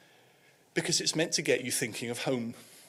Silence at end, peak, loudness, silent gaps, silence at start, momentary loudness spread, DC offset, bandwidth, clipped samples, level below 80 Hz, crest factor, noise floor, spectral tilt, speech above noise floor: 0 s; -14 dBFS; -30 LUFS; none; 0.75 s; 8 LU; under 0.1%; 16 kHz; under 0.1%; -76 dBFS; 20 dB; -63 dBFS; -2.5 dB/octave; 32 dB